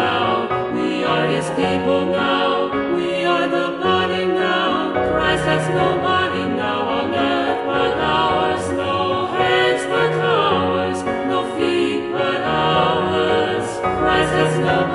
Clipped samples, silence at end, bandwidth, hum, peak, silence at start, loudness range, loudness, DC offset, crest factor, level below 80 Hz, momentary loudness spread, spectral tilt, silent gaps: under 0.1%; 0 s; 11.5 kHz; none; -4 dBFS; 0 s; 1 LU; -18 LUFS; under 0.1%; 16 dB; -44 dBFS; 4 LU; -5.5 dB/octave; none